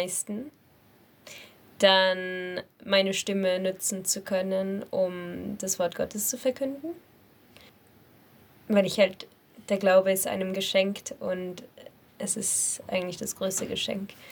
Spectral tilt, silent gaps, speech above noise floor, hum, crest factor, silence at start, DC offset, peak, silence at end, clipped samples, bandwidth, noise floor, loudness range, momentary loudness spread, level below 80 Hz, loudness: -3 dB/octave; none; 31 dB; none; 24 dB; 0 s; under 0.1%; -6 dBFS; 0 s; under 0.1%; over 20 kHz; -59 dBFS; 5 LU; 17 LU; -70 dBFS; -27 LUFS